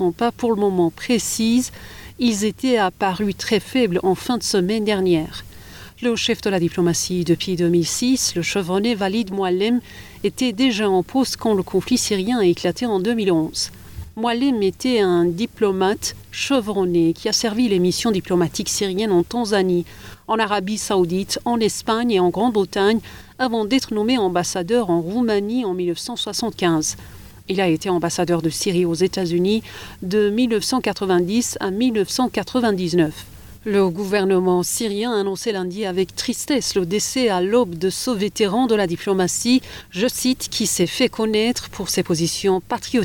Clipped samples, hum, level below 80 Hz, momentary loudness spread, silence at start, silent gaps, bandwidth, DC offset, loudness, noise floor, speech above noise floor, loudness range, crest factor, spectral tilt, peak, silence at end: under 0.1%; none; -50 dBFS; 6 LU; 0 s; none; 19 kHz; under 0.1%; -20 LUFS; -40 dBFS; 20 dB; 1 LU; 14 dB; -4.5 dB/octave; -6 dBFS; 0 s